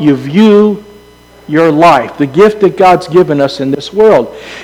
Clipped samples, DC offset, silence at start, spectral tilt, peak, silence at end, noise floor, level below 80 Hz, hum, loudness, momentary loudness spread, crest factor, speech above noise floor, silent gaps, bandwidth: 3%; under 0.1%; 0 s; -7 dB/octave; 0 dBFS; 0 s; -38 dBFS; -44 dBFS; 60 Hz at -40 dBFS; -8 LUFS; 9 LU; 8 dB; 31 dB; none; 13.5 kHz